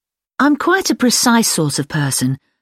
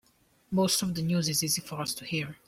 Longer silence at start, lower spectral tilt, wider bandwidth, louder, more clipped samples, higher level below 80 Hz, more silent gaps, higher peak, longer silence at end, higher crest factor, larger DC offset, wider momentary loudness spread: about the same, 0.4 s vs 0.5 s; about the same, -3.5 dB/octave vs -3.5 dB/octave; about the same, 16.5 kHz vs 16.5 kHz; first, -15 LUFS vs -29 LUFS; neither; first, -56 dBFS vs -62 dBFS; neither; first, -2 dBFS vs -14 dBFS; about the same, 0.25 s vs 0.15 s; about the same, 14 dB vs 16 dB; neither; about the same, 7 LU vs 8 LU